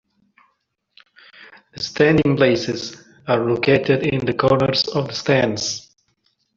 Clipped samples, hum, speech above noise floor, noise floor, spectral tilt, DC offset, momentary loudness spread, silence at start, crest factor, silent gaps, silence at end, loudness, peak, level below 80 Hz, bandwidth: under 0.1%; none; 52 dB; -70 dBFS; -5 dB/octave; under 0.1%; 12 LU; 1.4 s; 18 dB; none; 0.75 s; -18 LUFS; -2 dBFS; -52 dBFS; 7.6 kHz